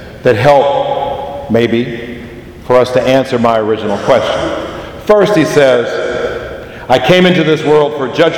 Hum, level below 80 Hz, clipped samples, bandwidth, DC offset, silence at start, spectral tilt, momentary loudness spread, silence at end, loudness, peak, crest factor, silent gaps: none; -38 dBFS; 0.5%; 17.5 kHz; under 0.1%; 0 s; -6 dB/octave; 15 LU; 0 s; -11 LUFS; 0 dBFS; 12 dB; none